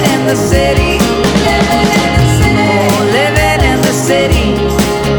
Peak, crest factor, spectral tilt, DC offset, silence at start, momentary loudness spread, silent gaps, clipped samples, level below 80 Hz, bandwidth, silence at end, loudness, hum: 0 dBFS; 10 dB; -5 dB/octave; under 0.1%; 0 s; 2 LU; none; under 0.1%; -20 dBFS; over 20 kHz; 0 s; -10 LUFS; none